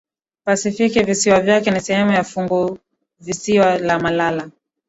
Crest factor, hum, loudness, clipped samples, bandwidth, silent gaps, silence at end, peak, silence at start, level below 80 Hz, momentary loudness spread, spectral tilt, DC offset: 16 dB; none; -17 LUFS; under 0.1%; 8.2 kHz; none; 0.4 s; -2 dBFS; 0.45 s; -52 dBFS; 13 LU; -4.5 dB/octave; under 0.1%